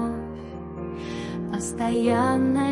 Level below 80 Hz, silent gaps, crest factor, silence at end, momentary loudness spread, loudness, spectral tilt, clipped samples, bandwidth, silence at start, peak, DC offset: -50 dBFS; none; 16 dB; 0 s; 14 LU; -26 LUFS; -6 dB/octave; under 0.1%; 11.5 kHz; 0 s; -10 dBFS; under 0.1%